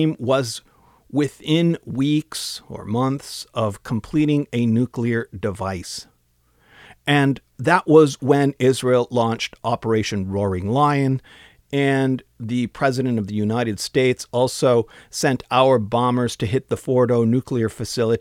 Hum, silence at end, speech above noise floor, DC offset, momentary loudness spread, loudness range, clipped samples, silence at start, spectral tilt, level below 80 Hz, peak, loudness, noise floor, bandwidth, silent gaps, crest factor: none; 0 s; 42 dB; under 0.1%; 10 LU; 5 LU; under 0.1%; 0 s; -6 dB/octave; -54 dBFS; -2 dBFS; -20 LUFS; -62 dBFS; 16 kHz; none; 18 dB